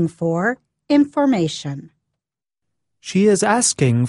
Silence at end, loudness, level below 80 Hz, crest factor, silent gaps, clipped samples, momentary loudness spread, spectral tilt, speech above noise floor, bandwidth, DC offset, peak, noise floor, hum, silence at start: 0 s; -18 LUFS; -58 dBFS; 16 dB; none; under 0.1%; 16 LU; -5 dB/octave; 66 dB; 11.5 kHz; under 0.1%; -2 dBFS; -83 dBFS; none; 0 s